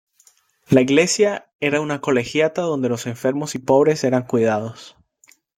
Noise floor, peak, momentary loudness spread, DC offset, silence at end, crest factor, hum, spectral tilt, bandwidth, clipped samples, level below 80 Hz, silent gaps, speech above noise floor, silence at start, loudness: -57 dBFS; -2 dBFS; 8 LU; under 0.1%; 0.7 s; 18 dB; none; -5 dB/octave; 16 kHz; under 0.1%; -58 dBFS; 1.55-1.59 s; 39 dB; 0.7 s; -19 LUFS